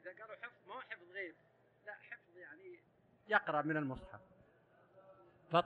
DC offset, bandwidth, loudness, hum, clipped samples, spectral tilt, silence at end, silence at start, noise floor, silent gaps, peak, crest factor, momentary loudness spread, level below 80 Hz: under 0.1%; 8.6 kHz; -41 LUFS; none; under 0.1%; -7 dB/octave; 0 s; 0.05 s; -71 dBFS; none; -16 dBFS; 26 dB; 22 LU; -72 dBFS